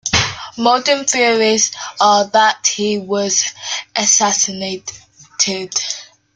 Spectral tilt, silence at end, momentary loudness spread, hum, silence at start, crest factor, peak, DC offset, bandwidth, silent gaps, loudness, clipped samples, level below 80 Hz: -1.5 dB/octave; 0.3 s; 12 LU; none; 0.05 s; 16 dB; 0 dBFS; under 0.1%; 11 kHz; none; -15 LUFS; under 0.1%; -50 dBFS